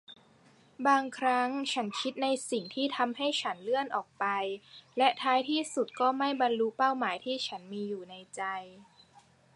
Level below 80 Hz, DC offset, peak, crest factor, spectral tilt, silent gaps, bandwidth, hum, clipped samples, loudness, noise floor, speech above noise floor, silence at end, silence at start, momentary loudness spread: -82 dBFS; under 0.1%; -10 dBFS; 22 dB; -3 dB/octave; none; 11.5 kHz; none; under 0.1%; -31 LUFS; -62 dBFS; 31 dB; 0.7 s; 0.1 s; 10 LU